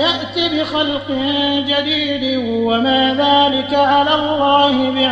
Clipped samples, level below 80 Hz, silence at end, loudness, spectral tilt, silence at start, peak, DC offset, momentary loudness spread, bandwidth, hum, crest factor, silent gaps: under 0.1%; -52 dBFS; 0 s; -15 LUFS; -5 dB/octave; 0 s; -2 dBFS; under 0.1%; 6 LU; 8 kHz; none; 14 dB; none